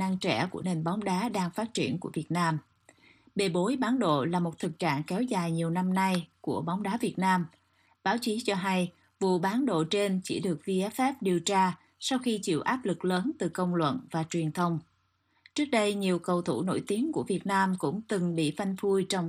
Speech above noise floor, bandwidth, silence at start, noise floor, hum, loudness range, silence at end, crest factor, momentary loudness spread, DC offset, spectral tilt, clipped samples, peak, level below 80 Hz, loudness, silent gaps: 43 dB; 15 kHz; 0 s; -72 dBFS; none; 2 LU; 0 s; 18 dB; 5 LU; under 0.1%; -5.5 dB/octave; under 0.1%; -12 dBFS; -72 dBFS; -30 LUFS; none